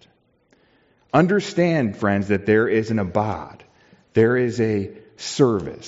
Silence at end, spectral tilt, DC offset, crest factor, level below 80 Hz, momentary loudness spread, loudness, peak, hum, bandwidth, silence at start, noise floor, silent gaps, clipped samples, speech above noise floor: 0 s; -6 dB/octave; under 0.1%; 18 dB; -56 dBFS; 10 LU; -20 LUFS; -4 dBFS; none; 8 kHz; 1.15 s; -61 dBFS; none; under 0.1%; 41 dB